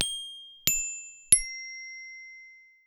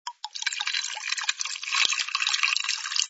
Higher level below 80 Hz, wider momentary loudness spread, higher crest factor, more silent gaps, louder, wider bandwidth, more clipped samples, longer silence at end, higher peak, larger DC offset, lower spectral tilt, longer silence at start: first, -54 dBFS vs -76 dBFS; first, 22 LU vs 7 LU; about the same, 28 dB vs 24 dB; neither; about the same, -25 LUFS vs -25 LUFS; first, over 20 kHz vs 8.2 kHz; neither; first, 0.3 s vs 0 s; about the same, -4 dBFS vs -4 dBFS; neither; first, 1 dB/octave vs 5.5 dB/octave; about the same, 0 s vs 0.05 s